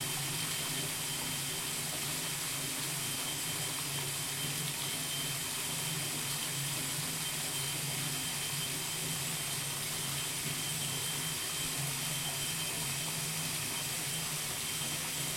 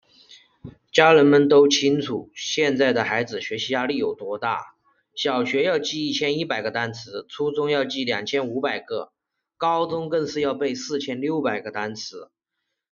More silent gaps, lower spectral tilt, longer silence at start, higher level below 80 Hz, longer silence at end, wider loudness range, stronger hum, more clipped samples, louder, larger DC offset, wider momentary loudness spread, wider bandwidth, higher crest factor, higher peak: neither; second, -1.5 dB/octave vs -3 dB/octave; second, 0 s vs 0.3 s; about the same, -64 dBFS vs -66 dBFS; second, 0 s vs 0.7 s; second, 0 LU vs 7 LU; neither; neither; second, -34 LUFS vs -22 LUFS; neither; second, 1 LU vs 14 LU; first, 16.5 kHz vs 7.2 kHz; second, 14 dB vs 22 dB; second, -22 dBFS vs 0 dBFS